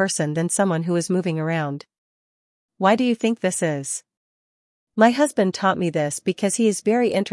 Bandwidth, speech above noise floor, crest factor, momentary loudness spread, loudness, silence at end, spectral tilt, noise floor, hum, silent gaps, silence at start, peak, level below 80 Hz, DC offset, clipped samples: 12 kHz; over 69 dB; 20 dB; 8 LU; -21 LUFS; 0 s; -5 dB/octave; under -90 dBFS; none; 1.98-2.69 s, 4.17-4.87 s; 0 s; -2 dBFS; -72 dBFS; under 0.1%; under 0.1%